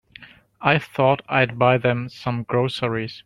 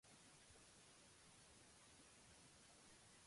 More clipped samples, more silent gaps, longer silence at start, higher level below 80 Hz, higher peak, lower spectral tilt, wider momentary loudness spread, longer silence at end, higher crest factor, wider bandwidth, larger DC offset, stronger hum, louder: neither; neither; first, 0.2 s vs 0.05 s; first, -56 dBFS vs -82 dBFS; first, 0 dBFS vs -56 dBFS; first, -7 dB/octave vs -2 dB/octave; first, 8 LU vs 0 LU; about the same, 0.05 s vs 0 s; first, 20 dB vs 12 dB; about the same, 12 kHz vs 11.5 kHz; neither; neither; first, -21 LUFS vs -66 LUFS